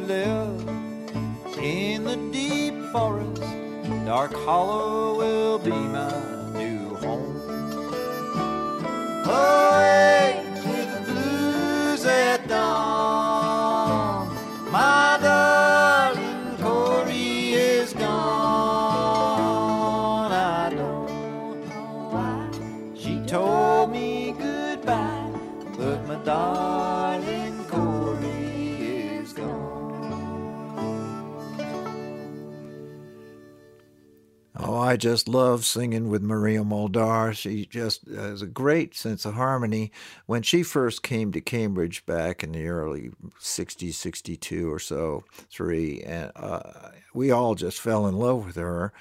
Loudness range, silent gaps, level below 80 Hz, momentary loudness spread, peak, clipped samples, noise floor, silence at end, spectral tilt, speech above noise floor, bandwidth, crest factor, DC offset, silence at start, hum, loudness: 11 LU; none; -54 dBFS; 14 LU; -4 dBFS; under 0.1%; -57 dBFS; 0.1 s; -5 dB/octave; 33 dB; 16 kHz; 20 dB; under 0.1%; 0 s; none; -24 LUFS